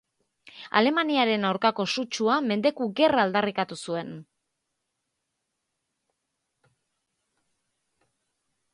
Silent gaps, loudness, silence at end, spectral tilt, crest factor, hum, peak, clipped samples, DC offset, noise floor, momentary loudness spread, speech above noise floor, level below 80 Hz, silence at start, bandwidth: none; -25 LUFS; 4.5 s; -4.5 dB/octave; 24 dB; none; -4 dBFS; under 0.1%; under 0.1%; -81 dBFS; 11 LU; 56 dB; -72 dBFS; 0.55 s; 11.5 kHz